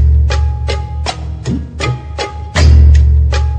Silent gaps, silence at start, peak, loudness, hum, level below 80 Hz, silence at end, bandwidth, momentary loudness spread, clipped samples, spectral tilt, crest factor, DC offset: none; 0 s; 0 dBFS; -13 LUFS; none; -12 dBFS; 0 s; 8.6 kHz; 13 LU; 0.4%; -6 dB/octave; 10 dB; under 0.1%